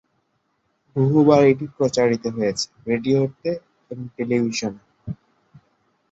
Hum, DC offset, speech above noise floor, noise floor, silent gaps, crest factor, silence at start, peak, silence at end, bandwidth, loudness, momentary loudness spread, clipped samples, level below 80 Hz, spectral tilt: none; under 0.1%; 50 dB; -70 dBFS; none; 20 dB; 0.95 s; -2 dBFS; 0.95 s; 8 kHz; -20 LUFS; 21 LU; under 0.1%; -58 dBFS; -6 dB/octave